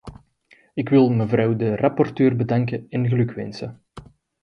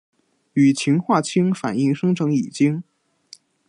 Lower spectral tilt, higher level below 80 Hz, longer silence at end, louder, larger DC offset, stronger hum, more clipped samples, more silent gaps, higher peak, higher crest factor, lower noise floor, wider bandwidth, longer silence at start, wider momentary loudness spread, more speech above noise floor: first, -9.5 dB/octave vs -6.5 dB/octave; first, -54 dBFS vs -68 dBFS; second, 0.4 s vs 0.85 s; about the same, -21 LUFS vs -20 LUFS; neither; neither; neither; neither; about the same, -4 dBFS vs -4 dBFS; about the same, 18 dB vs 16 dB; first, -57 dBFS vs -49 dBFS; second, 6.6 kHz vs 11 kHz; second, 0.05 s vs 0.55 s; first, 14 LU vs 4 LU; first, 37 dB vs 31 dB